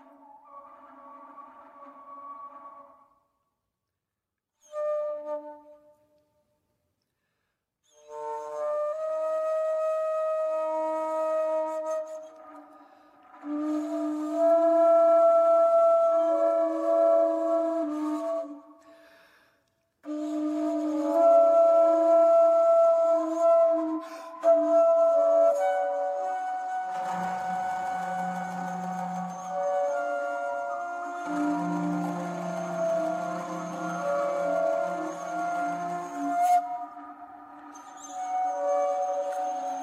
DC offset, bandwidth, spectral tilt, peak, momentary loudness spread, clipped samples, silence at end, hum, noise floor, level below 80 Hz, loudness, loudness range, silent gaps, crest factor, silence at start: under 0.1%; 11.5 kHz; -6.5 dB/octave; -12 dBFS; 18 LU; under 0.1%; 0 s; none; -87 dBFS; -82 dBFS; -26 LUFS; 16 LU; none; 14 dB; 0.3 s